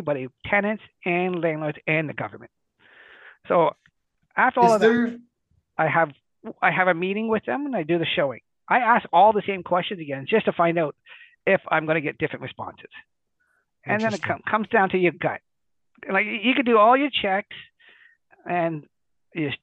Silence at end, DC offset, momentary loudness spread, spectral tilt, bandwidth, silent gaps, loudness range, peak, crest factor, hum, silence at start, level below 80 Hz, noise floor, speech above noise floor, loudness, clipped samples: 0.05 s; under 0.1%; 17 LU; -6 dB/octave; 9.4 kHz; none; 5 LU; -4 dBFS; 20 dB; none; 0 s; -64 dBFS; -73 dBFS; 51 dB; -22 LUFS; under 0.1%